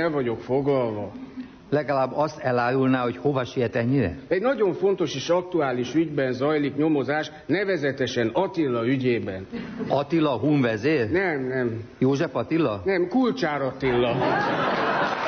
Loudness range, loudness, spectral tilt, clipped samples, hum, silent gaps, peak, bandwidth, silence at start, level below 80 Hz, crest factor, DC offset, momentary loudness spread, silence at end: 1 LU; -24 LUFS; -6.5 dB/octave; under 0.1%; none; none; -10 dBFS; 6.6 kHz; 0 s; -54 dBFS; 14 dB; under 0.1%; 5 LU; 0 s